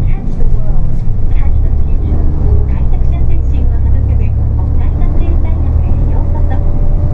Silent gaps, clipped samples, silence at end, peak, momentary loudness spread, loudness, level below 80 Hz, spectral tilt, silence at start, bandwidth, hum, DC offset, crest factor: none; 0.1%; 0 s; 0 dBFS; 4 LU; -15 LUFS; -10 dBFS; -11 dB/octave; 0 s; 2.7 kHz; none; under 0.1%; 8 dB